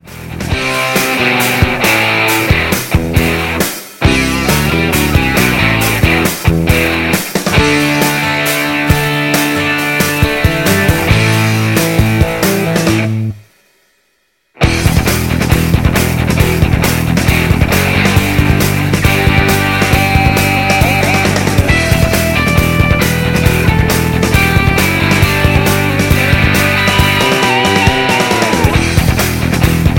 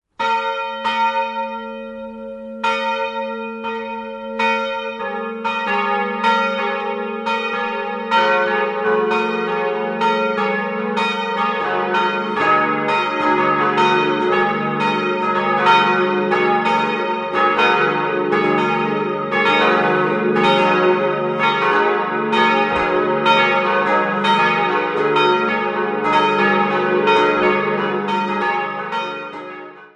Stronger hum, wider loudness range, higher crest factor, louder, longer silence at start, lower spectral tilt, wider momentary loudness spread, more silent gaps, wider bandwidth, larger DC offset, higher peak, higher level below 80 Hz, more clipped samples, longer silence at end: neither; second, 3 LU vs 6 LU; about the same, 12 dB vs 16 dB; first, -11 LUFS vs -17 LUFS; second, 0.05 s vs 0.2 s; about the same, -4.5 dB/octave vs -5.5 dB/octave; second, 3 LU vs 10 LU; neither; first, 17 kHz vs 10 kHz; neither; about the same, 0 dBFS vs -2 dBFS; first, -22 dBFS vs -58 dBFS; neither; about the same, 0 s vs 0.1 s